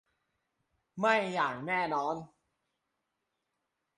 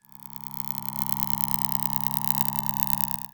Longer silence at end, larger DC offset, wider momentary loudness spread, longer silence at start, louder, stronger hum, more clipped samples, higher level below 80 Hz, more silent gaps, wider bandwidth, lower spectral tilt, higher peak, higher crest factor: first, 1.7 s vs 0.05 s; neither; about the same, 11 LU vs 10 LU; first, 0.95 s vs 0.2 s; second, -31 LUFS vs -24 LUFS; neither; neither; second, -76 dBFS vs -56 dBFS; neither; second, 11 kHz vs over 20 kHz; first, -5 dB/octave vs -3 dB/octave; second, -12 dBFS vs 0 dBFS; about the same, 24 dB vs 28 dB